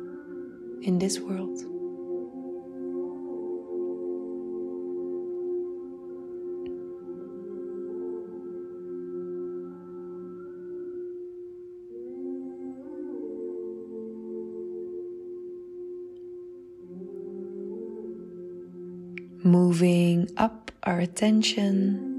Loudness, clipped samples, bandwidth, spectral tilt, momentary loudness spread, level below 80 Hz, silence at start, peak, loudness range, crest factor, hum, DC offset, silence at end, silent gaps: -31 LUFS; under 0.1%; 12 kHz; -6 dB/octave; 18 LU; -66 dBFS; 0 s; -10 dBFS; 14 LU; 22 dB; none; under 0.1%; 0 s; none